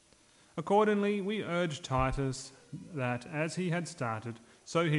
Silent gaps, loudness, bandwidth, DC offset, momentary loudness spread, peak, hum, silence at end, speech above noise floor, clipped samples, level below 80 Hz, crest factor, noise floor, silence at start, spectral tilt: none; -33 LUFS; 11.5 kHz; under 0.1%; 16 LU; -16 dBFS; none; 0 s; 31 dB; under 0.1%; -50 dBFS; 18 dB; -63 dBFS; 0.55 s; -6 dB/octave